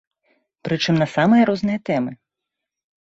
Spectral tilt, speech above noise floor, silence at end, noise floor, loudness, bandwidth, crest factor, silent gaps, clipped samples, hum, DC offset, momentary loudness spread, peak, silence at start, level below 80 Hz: -6.5 dB/octave; 65 dB; 0.9 s; -83 dBFS; -19 LUFS; 7.8 kHz; 16 dB; none; under 0.1%; none; under 0.1%; 12 LU; -4 dBFS; 0.65 s; -60 dBFS